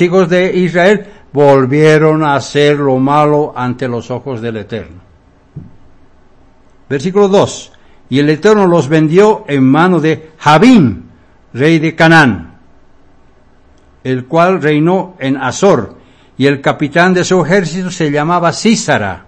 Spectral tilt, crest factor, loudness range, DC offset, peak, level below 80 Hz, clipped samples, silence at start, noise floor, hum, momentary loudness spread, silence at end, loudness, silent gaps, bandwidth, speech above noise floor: -6 dB/octave; 12 dB; 8 LU; under 0.1%; 0 dBFS; -46 dBFS; 1%; 0 s; -45 dBFS; none; 12 LU; 0.1 s; -10 LUFS; none; 11 kHz; 35 dB